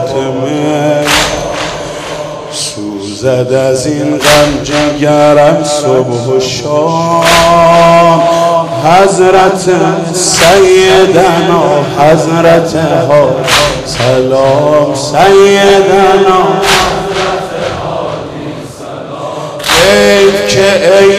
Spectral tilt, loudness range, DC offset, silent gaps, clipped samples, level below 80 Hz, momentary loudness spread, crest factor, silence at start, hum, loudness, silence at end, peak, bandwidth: -4 dB/octave; 6 LU; under 0.1%; none; 1%; -34 dBFS; 13 LU; 8 dB; 0 s; none; -7 LUFS; 0 s; 0 dBFS; 15.5 kHz